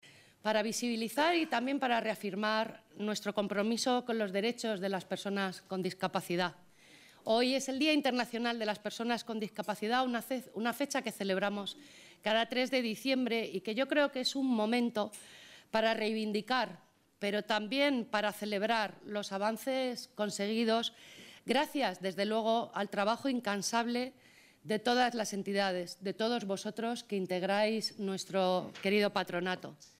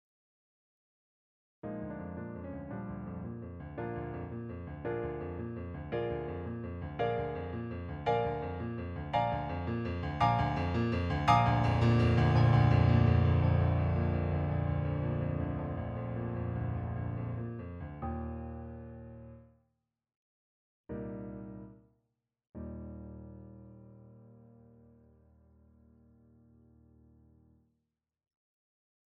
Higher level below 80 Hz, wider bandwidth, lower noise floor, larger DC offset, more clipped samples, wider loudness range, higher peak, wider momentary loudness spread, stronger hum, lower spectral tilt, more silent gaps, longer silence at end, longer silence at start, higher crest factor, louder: second, -80 dBFS vs -48 dBFS; first, 16 kHz vs 7 kHz; second, -60 dBFS vs -85 dBFS; neither; neither; second, 2 LU vs 21 LU; second, -16 dBFS vs -12 dBFS; second, 8 LU vs 20 LU; neither; second, -4 dB/octave vs -8.5 dB/octave; second, none vs 20.16-20.84 s, 22.49-22.53 s; second, 0.15 s vs 4.85 s; second, 0.05 s vs 1.65 s; about the same, 18 dB vs 22 dB; about the same, -34 LUFS vs -33 LUFS